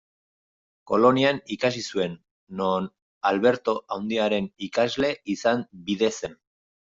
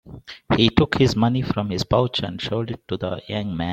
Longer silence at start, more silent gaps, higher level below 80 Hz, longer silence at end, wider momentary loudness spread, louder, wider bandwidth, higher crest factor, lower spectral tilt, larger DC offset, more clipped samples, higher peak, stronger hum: first, 0.85 s vs 0.05 s; first, 2.31-2.47 s, 3.02-3.21 s vs none; second, -64 dBFS vs -42 dBFS; first, 0.65 s vs 0 s; about the same, 11 LU vs 10 LU; second, -25 LUFS vs -22 LUFS; second, 7.8 kHz vs 14.5 kHz; about the same, 20 dB vs 20 dB; second, -5 dB/octave vs -6.5 dB/octave; neither; neither; second, -6 dBFS vs -2 dBFS; neither